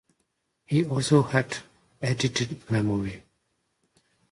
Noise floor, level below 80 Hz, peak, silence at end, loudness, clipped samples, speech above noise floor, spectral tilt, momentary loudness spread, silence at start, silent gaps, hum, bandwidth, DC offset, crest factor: -76 dBFS; -56 dBFS; -8 dBFS; 1.15 s; -26 LUFS; under 0.1%; 51 dB; -5.5 dB/octave; 13 LU; 0.7 s; none; none; 11.5 kHz; under 0.1%; 20 dB